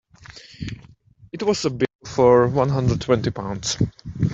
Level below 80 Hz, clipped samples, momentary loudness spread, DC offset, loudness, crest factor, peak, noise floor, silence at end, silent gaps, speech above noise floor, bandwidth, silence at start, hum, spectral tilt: -44 dBFS; under 0.1%; 21 LU; under 0.1%; -21 LUFS; 18 dB; -4 dBFS; -50 dBFS; 0 s; 1.95-1.99 s; 30 dB; 8 kHz; 0.3 s; none; -6 dB/octave